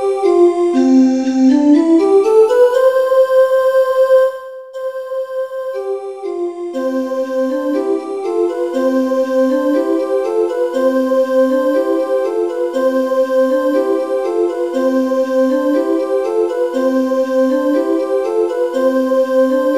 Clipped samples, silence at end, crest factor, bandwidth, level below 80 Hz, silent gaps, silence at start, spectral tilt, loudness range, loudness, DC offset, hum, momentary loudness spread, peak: under 0.1%; 0 s; 12 dB; 14 kHz; -64 dBFS; none; 0 s; -4.5 dB/octave; 8 LU; -14 LUFS; 0.2%; none; 11 LU; 0 dBFS